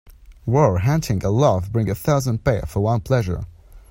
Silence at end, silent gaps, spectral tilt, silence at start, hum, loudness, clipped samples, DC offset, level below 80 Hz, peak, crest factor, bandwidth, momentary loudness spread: 0.1 s; none; -7 dB/octave; 0.05 s; none; -20 LUFS; under 0.1%; under 0.1%; -38 dBFS; -4 dBFS; 16 dB; 16.5 kHz; 8 LU